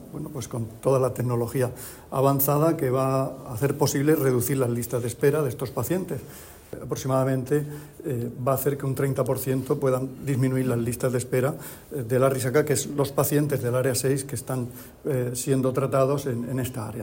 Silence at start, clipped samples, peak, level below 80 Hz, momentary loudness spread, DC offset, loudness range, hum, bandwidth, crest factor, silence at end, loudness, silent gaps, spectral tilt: 0 s; under 0.1%; -8 dBFS; -54 dBFS; 11 LU; under 0.1%; 3 LU; none; 16.5 kHz; 18 dB; 0 s; -25 LUFS; none; -6 dB/octave